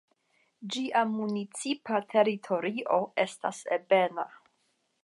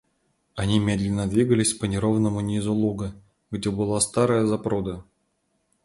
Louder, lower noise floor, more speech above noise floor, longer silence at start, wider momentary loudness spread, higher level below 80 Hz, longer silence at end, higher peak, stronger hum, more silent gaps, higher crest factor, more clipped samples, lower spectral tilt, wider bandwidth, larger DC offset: second, -29 LUFS vs -24 LUFS; about the same, -74 dBFS vs -72 dBFS; second, 45 dB vs 49 dB; about the same, 0.6 s vs 0.55 s; about the same, 10 LU vs 12 LU; second, -86 dBFS vs -46 dBFS; about the same, 0.7 s vs 0.8 s; second, -10 dBFS vs -6 dBFS; neither; neither; about the same, 20 dB vs 18 dB; neither; about the same, -4.5 dB/octave vs -5.5 dB/octave; about the same, 11.5 kHz vs 11.5 kHz; neither